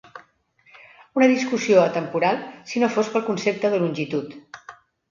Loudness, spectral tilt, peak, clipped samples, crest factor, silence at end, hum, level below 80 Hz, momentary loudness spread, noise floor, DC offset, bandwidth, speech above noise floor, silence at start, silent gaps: -22 LUFS; -5.5 dB/octave; -2 dBFS; under 0.1%; 20 dB; 0.4 s; none; -70 dBFS; 14 LU; -59 dBFS; under 0.1%; 7.4 kHz; 38 dB; 0.15 s; none